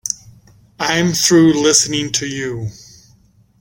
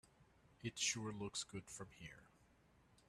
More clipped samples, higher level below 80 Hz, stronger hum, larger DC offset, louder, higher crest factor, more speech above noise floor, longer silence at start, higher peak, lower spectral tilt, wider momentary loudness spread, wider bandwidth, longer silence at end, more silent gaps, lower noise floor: neither; first, -50 dBFS vs -74 dBFS; neither; neither; first, -14 LUFS vs -45 LUFS; about the same, 18 dB vs 22 dB; first, 37 dB vs 25 dB; about the same, 0.05 s vs 0.05 s; first, 0 dBFS vs -28 dBFS; about the same, -3 dB/octave vs -2.5 dB/octave; second, 15 LU vs 18 LU; first, 16.5 kHz vs 13 kHz; first, 0.9 s vs 0.1 s; neither; second, -52 dBFS vs -72 dBFS